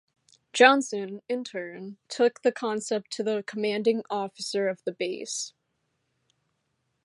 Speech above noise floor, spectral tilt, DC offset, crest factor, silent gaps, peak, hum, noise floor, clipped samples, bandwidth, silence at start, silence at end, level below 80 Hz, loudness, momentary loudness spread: 50 dB; -3 dB/octave; under 0.1%; 26 dB; none; -2 dBFS; none; -77 dBFS; under 0.1%; 11.5 kHz; 0.55 s; 1.55 s; -84 dBFS; -27 LUFS; 17 LU